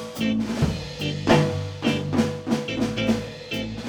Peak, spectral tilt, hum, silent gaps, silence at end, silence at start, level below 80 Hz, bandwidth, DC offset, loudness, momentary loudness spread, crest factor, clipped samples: -4 dBFS; -6 dB/octave; none; none; 0 s; 0 s; -44 dBFS; over 20 kHz; under 0.1%; -24 LUFS; 9 LU; 20 dB; under 0.1%